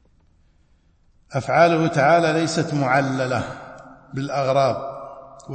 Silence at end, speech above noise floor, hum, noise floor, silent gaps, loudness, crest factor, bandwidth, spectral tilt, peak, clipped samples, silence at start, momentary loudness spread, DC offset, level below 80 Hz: 0 s; 39 dB; none; -58 dBFS; none; -20 LUFS; 20 dB; 8.8 kHz; -6 dB/octave; -2 dBFS; under 0.1%; 1.3 s; 20 LU; under 0.1%; -56 dBFS